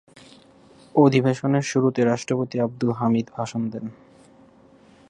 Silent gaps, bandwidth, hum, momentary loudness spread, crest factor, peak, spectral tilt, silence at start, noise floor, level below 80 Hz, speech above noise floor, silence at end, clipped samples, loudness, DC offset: none; 10.5 kHz; none; 11 LU; 20 dB; -4 dBFS; -6.5 dB/octave; 0.95 s; -52 dBFS; -64 dBFS; 31 dB; 1.2 s; under 0.1%; -22 LUFS; under 0.1%